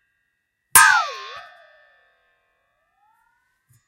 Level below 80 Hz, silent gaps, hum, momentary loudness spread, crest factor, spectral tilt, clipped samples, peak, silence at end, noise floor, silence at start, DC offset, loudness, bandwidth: -62 dBFS; none; none; 25 LU; 24 dB; 2 dB/octave; under 0.1%; 0 dBFS; 2.45 s; -74 dBFS; 0.75 s; under 0.1%; -14 LUFS; 16 kHz